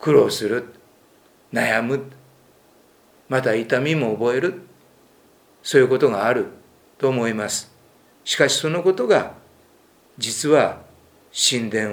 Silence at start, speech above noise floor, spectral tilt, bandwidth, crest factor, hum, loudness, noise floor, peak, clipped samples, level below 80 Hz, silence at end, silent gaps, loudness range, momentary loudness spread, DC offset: 0 s; 35 dB; -4 dB/octave; over 20 kHz; 20 dB; none; -20 LUFS; -55 dBFS; -2 dBFS; under 0.1%; -66 dBFS; 0 s; none; 3 LU; 14 LU; under 0.1%